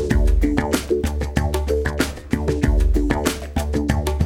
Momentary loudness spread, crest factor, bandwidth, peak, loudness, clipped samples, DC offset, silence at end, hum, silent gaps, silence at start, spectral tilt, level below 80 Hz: 4 LU; 16 dB; 16.5 kHz; -2 dBFS; -21 LUFS; under 0.1%; under 0.1%; 0 s; none; none; 0 s; -6 dB/octave; -22 dBFS